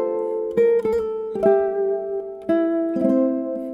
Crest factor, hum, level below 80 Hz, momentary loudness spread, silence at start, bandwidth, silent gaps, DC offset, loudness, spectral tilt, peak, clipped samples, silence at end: 16 dB; none; -56 dBFS; 8 LU; 0 s; 7.4 kHz; none; under 0.1%; -21 LUFS; -8.5 dB/octave; -6 dBFS; under 0.1%; 0 s